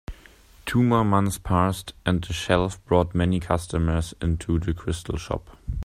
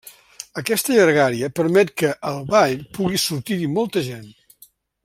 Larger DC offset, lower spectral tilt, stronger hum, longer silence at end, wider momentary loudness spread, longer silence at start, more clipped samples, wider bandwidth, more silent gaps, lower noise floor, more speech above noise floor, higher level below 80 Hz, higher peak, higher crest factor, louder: neither; first, -6.5 dB/octave vs -4.5 dB/octave; neither; second, 0 s vs 0.75 s; second, 10 LU vs 13 LU; about the same, 0.1 s vs 0.05 s; neither; about the same, 15 kHz vs 16 kHz; neither; about the same, -51 dBFS vs -53 dBFS; second, 28 dB vs 34 dB; first, -38 dBFS vs -58 dBFS; about the same, -4 dBFS vs -2 dBFS; about the same, 20 dB vs 20 dB; second, -24 LUFS vs -19 LUFS